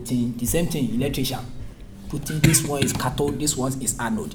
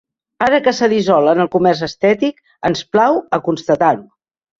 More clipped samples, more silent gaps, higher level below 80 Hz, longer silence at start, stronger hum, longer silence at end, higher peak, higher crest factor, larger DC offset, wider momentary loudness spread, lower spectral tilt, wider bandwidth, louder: neither; neither; first, -38 dBFS vs -54 dBFS; second, 0 s vs 0.4 s; neither; second, 0 s vs 0.55 s; about the same, -2 dBFS vs 0 dBFS; first, 22 dB vs 14 dB; neither; first, 16 LU vs 7 LU; about the same, -4.5 dB/octave vs -5.5 dB/octave; first, over 20 kHz vs 7.8 kHz; second, -23 LUFS vs -15 LUFS